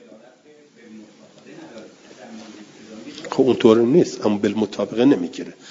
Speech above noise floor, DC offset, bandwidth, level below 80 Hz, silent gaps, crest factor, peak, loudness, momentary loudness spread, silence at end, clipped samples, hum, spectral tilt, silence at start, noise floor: 33 dB; under 0.1%; 7.8 kHz; -66 dBFS; none; 20 dB; -2 dBFS; -18 LUFS; 26 LU; 0 s; under 0.1%; none; -6.5 dB/octave; 0.9 s; -50 dBFS